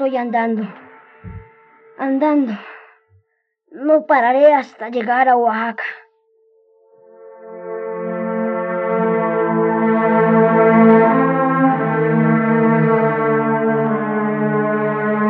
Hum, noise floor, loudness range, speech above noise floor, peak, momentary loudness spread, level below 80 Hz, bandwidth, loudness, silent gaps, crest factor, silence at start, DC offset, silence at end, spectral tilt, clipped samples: none; -67 dBFS; 10 LU; 52 dB; -2 dBFS; 14 LU; -60 dBFS; 5.4 kHz; -16 LUFS; none; 16 dB; 0 s; under 0.1%; 0 s; -10 dB/octave; under 0.1%